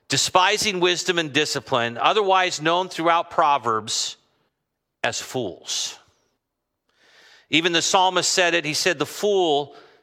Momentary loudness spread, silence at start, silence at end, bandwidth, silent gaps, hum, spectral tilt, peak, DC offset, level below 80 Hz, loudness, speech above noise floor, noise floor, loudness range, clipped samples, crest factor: 9 LU; 0.1 s; 0.25 s; 16 kHz; none; none; -2 dB/octave; -2 dBFS; under 0.1%; -68 dBFS; -21 LUFS; 58 dB; -80 dBFS; 9 LU; under 0.1%; 20 dB